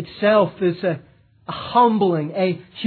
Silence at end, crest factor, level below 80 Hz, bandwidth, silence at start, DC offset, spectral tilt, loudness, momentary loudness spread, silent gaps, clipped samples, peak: 0 s; 16 dB; -60 dBFS; 4.6 kHz; 0 s; under 0.1%; -10 dB/octave; -19 LUFS; 15 LU; none; under 0.1%; -4 dBFS